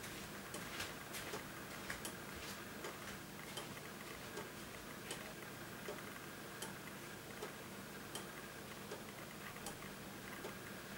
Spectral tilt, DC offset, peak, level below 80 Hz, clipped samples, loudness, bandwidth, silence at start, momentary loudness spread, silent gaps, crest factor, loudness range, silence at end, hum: -3 dB/octave; under 0.1%; -28 dBFS; -70 dBFS; under 0.1%; -49 LUFS; 19 kHz; 0 s; 4 LU; none; 22 dB; 2 LU; 0 s; none